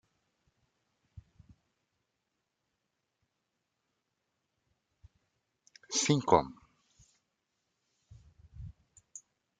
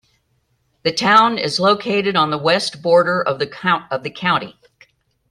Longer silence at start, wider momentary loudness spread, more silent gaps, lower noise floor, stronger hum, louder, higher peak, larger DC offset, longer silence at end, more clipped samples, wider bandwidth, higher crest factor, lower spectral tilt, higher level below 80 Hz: first, 5.9 s vs 0.85 s; first, 25 LU vs 9 LU; neither; first, -84 dBFS vs -65 dBFS; neither; second, -29 LUFS vs -17 LUFS; second, -8 dBFS vs 0 dBFS; neither; second, 0.4 s vs 0.8 s; neither; second, 9.4 kHz vs 12 kHz; first, 32 dB vs 18 dB; about the same, -4 dB/octave vs -4.5 dB/octave; about the same, -64 dBFS vs -62 dBFS